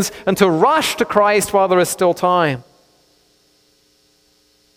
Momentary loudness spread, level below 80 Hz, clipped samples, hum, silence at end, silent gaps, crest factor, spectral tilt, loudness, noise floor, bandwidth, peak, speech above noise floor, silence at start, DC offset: 5 LU; -54 dBFS; under 0.1%; none; 2.15 s; none; 18 dB; -4 dB/octave; -15 LUFS; -57 dBFS; 17.5 kHz; 0 dBFS; 42 dB; 0 s; under 0.1%